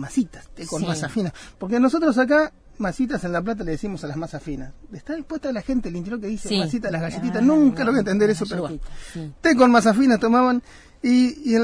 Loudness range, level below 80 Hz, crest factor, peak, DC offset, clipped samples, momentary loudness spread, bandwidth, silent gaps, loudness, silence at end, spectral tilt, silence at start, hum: 9 LU; -44 dBFS; 18 dB; -4 dBFS; under 0.1%; under 0.1%; 16 LU; 10.5 kHz; none; -21 LUFS; 0 s; -6 dB/octave; 0 s; none